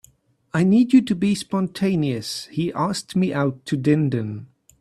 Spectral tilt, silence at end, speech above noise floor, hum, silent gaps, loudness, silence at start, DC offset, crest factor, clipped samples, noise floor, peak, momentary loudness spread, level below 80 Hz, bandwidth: -6.5 dB/octave; 0.35 s; 36 dB; none; none; -21 LUFS; 0.55 s; under 0.1%; 16 dB; under 0.1%; -56 dBFS; -4 dBFS; 10 LU; -58 dBFS; 13 kHz